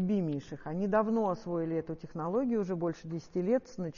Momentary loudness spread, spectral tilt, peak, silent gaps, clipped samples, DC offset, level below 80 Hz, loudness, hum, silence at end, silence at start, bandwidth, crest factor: 9 LU; -8 dB/octave; -16 dBFS; none; under 0.1%; under 0.1%; -62 dBFS; -33 LUFS; none; 0 s; 0 s; 7 kHz; 16 dB